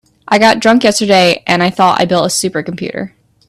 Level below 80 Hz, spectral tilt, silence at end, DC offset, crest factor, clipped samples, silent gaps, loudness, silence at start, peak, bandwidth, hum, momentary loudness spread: -50 dBFS; -4 dB/octave; 0.4 s; under 0.1%; 12 dB; under 0.1%; none; -11 LUFS; 0.3 s; 0 dBFS; 16 kHz; none; 12 LU